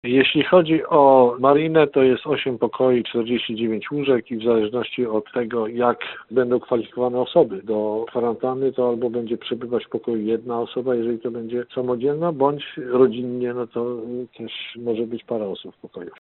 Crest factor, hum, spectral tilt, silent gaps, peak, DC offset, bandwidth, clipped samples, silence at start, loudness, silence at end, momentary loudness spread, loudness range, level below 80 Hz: 18 dB; none; -10.5 dB/octave; none; -2 dBFS; under 0.1%; 4.2 kHz; under 0.1%; 0.05 s; -21 LUFS; 0.1 s; 11 LU; 7 LU; -62 dBFS